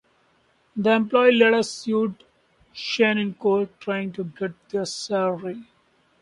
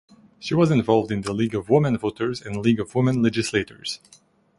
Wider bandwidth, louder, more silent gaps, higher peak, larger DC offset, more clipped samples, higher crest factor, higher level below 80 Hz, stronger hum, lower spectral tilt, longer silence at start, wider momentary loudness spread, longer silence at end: about the same, 11.5 kHz vs 11.5 kHz; about the same, -22 LUFS vs -22 LUFS; neither; about the same, -4 dBFS vs -4 dBFS; neither; neither; about the same, 20 dB vs 18 dB; second, -68 dBFS vs -52 dBFS; neither; second, -4.5 dB/octave vs -6.5 dB/octave; first, 0.75 s vs 0.4 s; first, 15 LU vs 11 LU; about the same, 0.6 s vs 0.65 s